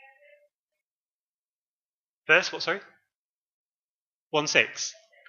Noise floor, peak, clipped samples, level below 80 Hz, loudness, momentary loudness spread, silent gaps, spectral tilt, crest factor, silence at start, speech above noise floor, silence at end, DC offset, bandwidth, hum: under -90 dBFS; -4 dBFS; under 0.1%; -88 dBFS; -25 LUFS; 12 LU; 3.15-4.31 s; -1.5 dB/octave; 28 dB; 2.3 s; over 65 dB; 0.35 s; under 0.1%; 7.6 kHz; none